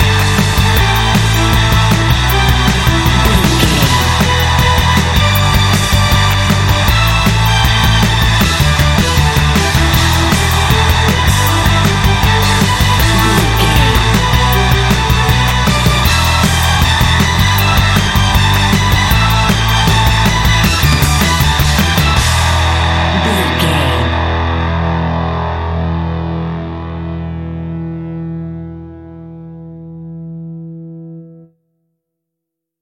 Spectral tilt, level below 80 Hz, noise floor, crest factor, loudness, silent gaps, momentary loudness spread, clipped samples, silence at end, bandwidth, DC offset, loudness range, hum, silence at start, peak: -4.5 dB/octave; -18 dBFS; -78 dBFS; 12 dB; -11 LUFS; none; 12 LU; under 0.1%; 1.45 s; 17 kHz; under 0.1%; 14 LU; none; 0 s; 0 dBFS